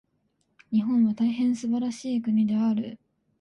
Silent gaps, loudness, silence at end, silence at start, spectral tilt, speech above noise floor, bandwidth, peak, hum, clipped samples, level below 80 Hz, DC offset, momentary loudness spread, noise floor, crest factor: none; -25 LUFS; 0.45 s; 0.7 s; -7 dB/octave; 48 dB; 9.8 kHz; -14 dBFS; none; under 0.1%; -70 dBFS; under 0.1%; 6 LU; -72 dBFS; 12 dB